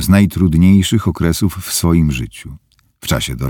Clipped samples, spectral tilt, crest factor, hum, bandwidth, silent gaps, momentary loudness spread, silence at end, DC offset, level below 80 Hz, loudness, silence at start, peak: under 0.1%; -5.5 dB/octave; 14 dB; none; 18.5 kHz; none; 14 LU; 0 s; under 0.1%; -28 dBFS; -14 LUFS; 0 s; 0 dBFS